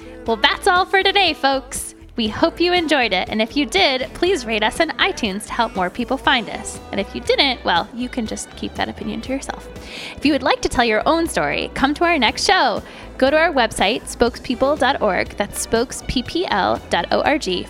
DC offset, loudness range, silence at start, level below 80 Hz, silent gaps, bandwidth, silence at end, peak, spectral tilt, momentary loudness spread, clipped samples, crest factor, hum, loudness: under 0.1%; 4 LU; 0 s; -40 dBFS; none; 16 kHz; 0 s; -2 dBFS; -3 dB/octave; 11 LU; under 0.1%; 18 dB; none; -18 LUFS